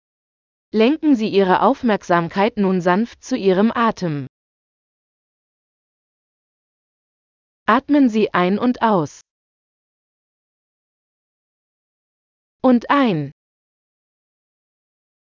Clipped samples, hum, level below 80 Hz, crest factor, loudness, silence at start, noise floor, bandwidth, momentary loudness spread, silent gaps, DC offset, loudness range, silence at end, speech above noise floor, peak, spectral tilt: under 0.1%; none; -60 dBFS; 20 dB; -17 LUFS; 0.75 s; under -90 dBFS; 7.4 kHz; 10 LU; 4.29-7.66 s, 9.31-12.59 s; under 0.1%; 9 LU; 1.9 s; over 73 dB; 0 dBFS; -7 dB/octave